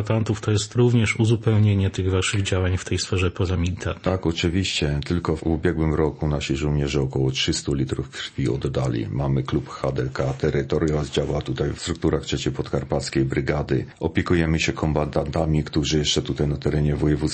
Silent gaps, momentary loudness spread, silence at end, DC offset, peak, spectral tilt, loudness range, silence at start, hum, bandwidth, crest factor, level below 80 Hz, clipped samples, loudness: none; 6 LU; 0 s; under 0.1%; -4 dBFS; -5.5 dB/octave; 3 LU; 0 s; none; 8.8 kHz; 18 dB; -36 dBFS; under 0.1%; -23 LUFS